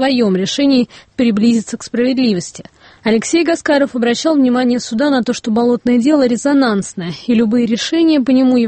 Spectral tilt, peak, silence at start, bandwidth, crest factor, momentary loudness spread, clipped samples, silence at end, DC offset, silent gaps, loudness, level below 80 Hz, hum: -5 dB/octave; -2 dBFS; 0 s; 8.8 kHz; 12 dB; 6 LU; under 0.1%; 0 s; under 0.1%; none; -14 LUFS; -52 dBFS; none